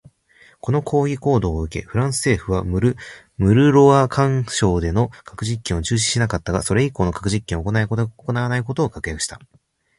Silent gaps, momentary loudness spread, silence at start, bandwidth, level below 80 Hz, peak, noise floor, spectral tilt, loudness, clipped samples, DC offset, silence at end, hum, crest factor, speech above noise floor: none; 11 LU; 0.65 s; 11.5 kHz; -36 dBFS; -2 dBFS; -53 dBFS; -5.5 dB/octave; -19 LUFS; under 0.1%; under 0.1%; 0.6 s; none; 18 dB; 34 dB